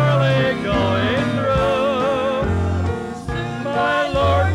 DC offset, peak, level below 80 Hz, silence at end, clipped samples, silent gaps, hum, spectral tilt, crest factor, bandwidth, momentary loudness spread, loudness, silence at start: under 0.1%; -8 dBFS; -34 dBFS; 0 s; under 0.1%; none; none; -6.5 dB/octave; 10 dB; 11.5 kHz; 7 LU; -19 LUFS; 0 s